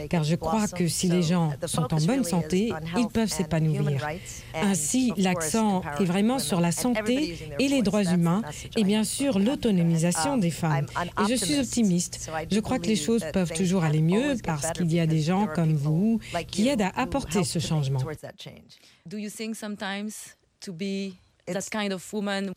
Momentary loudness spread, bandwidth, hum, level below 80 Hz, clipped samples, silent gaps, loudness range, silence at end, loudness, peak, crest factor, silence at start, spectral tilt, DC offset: 10 LU; 16 kHz; none; -50 dBFS; under 0.1%; none; 7 LU; 0 s; -26 LUFS; -10 dBFS; 14 dB; 0 s; -5.5 dB/octave; under 0.1%